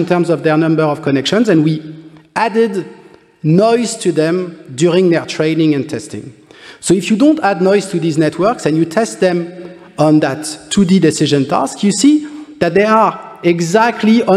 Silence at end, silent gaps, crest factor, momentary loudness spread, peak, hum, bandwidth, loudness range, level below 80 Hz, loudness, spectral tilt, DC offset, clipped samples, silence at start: 0 s; none; 12 dB; 12 LU; 0 dBFS; none; 13 kHz; 2 LU; -54 dBFS; -13 LUFS; -5.5 dB/octave; under 0.1%; under 0.1%; 0 s